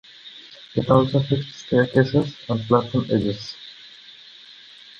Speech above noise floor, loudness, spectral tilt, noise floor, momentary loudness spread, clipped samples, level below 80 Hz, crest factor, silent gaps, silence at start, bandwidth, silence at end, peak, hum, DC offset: 25 dB; -21 LUFS; -7.5 dB/octave; -45 dBFS; 24 LU; under 0.1%; -52 dBFS; 20 dB; none; 0.25 s; 7.2 kHz; 0.45 s; -4 dBFS; none; under 0.1%